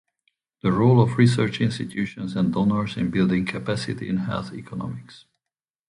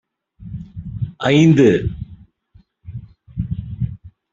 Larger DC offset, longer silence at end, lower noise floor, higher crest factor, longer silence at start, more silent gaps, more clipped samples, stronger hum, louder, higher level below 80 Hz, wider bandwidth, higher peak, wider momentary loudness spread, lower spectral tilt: neither; first, 0.7 s vs 0.25 s; first, -89 dBFS vs -53 dBFS; about the same, 18 dB vs 18 dB; first, 0.65 s vs 0.4 s; neither; neither; neither; second, -23 LUFS vs -17 LUFS; second, -52 dBFS vs -40 dBFS; first, 11 kHz vs 7.6 kHz; about the same, -4 dBFS vs -2 dBFS; second, 15 LU vs 24 LU; about the same, -7.5 dB/octave vs -7.5 dB/octave